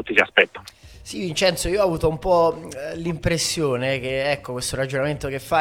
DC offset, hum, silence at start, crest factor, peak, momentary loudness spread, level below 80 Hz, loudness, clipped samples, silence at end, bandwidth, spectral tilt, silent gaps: under 0.1%; none; 0 s; 22 dB; 0 dBFS; 12 LU; -42 dBFS; -22 LUFS; under 0.1%; 0 s; 17 kHz; -4 dB/octave; none